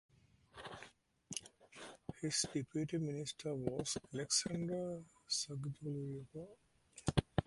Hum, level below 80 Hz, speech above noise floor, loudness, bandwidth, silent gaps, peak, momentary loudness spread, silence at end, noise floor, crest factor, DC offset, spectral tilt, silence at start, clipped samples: none; -60 dBFS; 21 dB; -41 LUFS; 11.5 kHz; none; -16 dBFS; 18 LU; 0.05 s; -63 dBFS; 26 dB; under 0.1%; -4 dB/octave; 0.55 s; under 0.1%